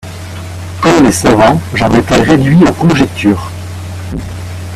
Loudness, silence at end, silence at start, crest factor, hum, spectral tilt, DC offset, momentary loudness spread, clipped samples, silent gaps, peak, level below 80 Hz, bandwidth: -9 LUFS; 0 s; 0.05 s; 10 dB; none; -6 dB/octave; under 0.1%; 16 LU; 0.4%; none; 0 dBFS; -30 dBFS; 15 kHz